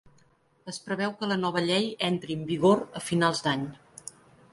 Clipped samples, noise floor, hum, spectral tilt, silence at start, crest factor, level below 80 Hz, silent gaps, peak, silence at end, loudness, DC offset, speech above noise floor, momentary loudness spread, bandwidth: under 0.1%; -63 dBFS; none; -5 dB/octave; 0.65 s; 20 dB; -66 dBFS; none; -8 dBFS; 0.45 s; -27 LUFS; under 0.1%; 36 dB; 20 LU; 11.5 kHz